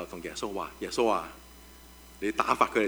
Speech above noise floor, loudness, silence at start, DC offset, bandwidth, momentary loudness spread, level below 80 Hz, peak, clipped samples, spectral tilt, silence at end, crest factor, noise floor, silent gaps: 22 dB; -30 LUFS; 0 s; under 0.1%; over 20 kHz; 24 LU; -54 dBFS; -6 dBFS; under 0.1%; -3.5 dB/octave; 0 s; 24 dB; -51 dBFS; none